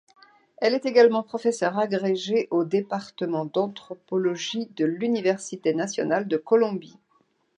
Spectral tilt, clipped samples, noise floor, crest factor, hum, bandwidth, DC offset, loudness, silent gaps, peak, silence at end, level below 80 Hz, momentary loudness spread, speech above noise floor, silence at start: -5 dB/octave; under 0.1%; -67 dBFS; 20 dB; none; 10 kHz; under 0.1%; -24 LUFS; none; -6 dBFS; 0.7 s; -78 dBFS; 9 LU; 43 dB; 0.6 s